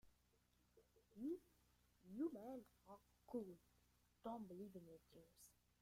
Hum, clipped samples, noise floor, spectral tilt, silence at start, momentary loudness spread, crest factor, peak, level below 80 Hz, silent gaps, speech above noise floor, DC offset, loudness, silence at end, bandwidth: none; under 0.1%; -81 dBFS; -7 dB/octave; 0.05 s; 17 LU; 20 dB; -38 dBFS; -82 dBFS; none; 27 dB; under 0.1%; -54 LUFS; 0.3 s; 16 kHz